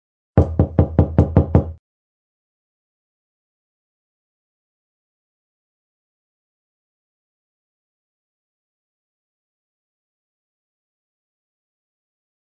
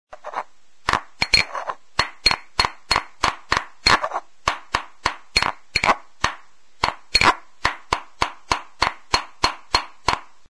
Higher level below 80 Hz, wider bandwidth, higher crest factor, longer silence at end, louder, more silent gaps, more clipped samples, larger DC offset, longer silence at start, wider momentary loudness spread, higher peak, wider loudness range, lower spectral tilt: first, -34 dBFS vs -40 dBFS; second, 3.3 kHz vs 11 kHz; about the same, 24 dB vs 22 dB; first, 10.8 s vs 0.35 s; first, -18 LUFS vs -22 LUFS; neither; neither; second, under 0.1% vs 0.6%; first, 0.35 s vs 0.1 s; second, 4 LU vs 10 LU; about the same, -2 dBFS vs -2 dBFS; first, 8 LU vs 2 LU; first, -11.5 dB/octave vs -1.5 dB/octave